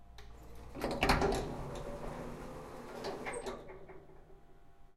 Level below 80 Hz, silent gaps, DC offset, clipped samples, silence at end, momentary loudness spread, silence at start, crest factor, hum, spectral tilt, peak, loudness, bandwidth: -48 dBFS; none; under 0.1%; under 0.1%; 0 s; 24 LU; 0 s; 24 dB; none; -5 dB/octave; -16 dBFS; -38 LUFS; 16 kHz